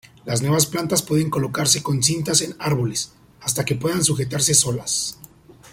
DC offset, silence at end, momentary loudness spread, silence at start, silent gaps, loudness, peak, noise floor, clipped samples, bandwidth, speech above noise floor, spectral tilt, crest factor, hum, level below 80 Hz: under 0.1%; 0 s; 8 LU; 0.25 s; none; -20 LUFS; -2 dBFS; -46 dBFS; under 0.1%; 16.5 kHz; 25 dB; -3.5 dB/octave; 20 dB; none; -52 dBFS